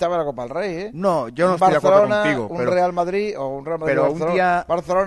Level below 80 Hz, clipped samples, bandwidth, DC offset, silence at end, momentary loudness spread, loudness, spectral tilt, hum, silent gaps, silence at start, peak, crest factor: -50 dBFS; under 0.1%; 12 kHz; under 0.1%; 0 s; 11 LU; -19 LUFS; -6 dB/octave; none; none; 0 s; -2 dBFS; 18 dB